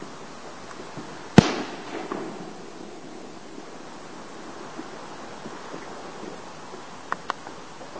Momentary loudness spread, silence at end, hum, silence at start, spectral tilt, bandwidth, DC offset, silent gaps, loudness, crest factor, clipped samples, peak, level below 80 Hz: 15 LU; 0 s; none; 0 s; -6 dB/octave; 8 kHz; 0.6%; none; -29 LUFS; 30 dB; under 0.1%; 0 dBFS; -52 dBFS